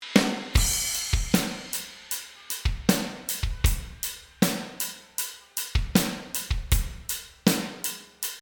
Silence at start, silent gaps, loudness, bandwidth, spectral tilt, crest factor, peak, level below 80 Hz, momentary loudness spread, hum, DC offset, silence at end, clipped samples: 0 s; none; -28 LUFS; over 20 kHz; -3.5 dB/octave; 24 dB; -2 dBFS; -34 dBFS; 9 LU; none; under 0.1%; 0 s; under 0.1%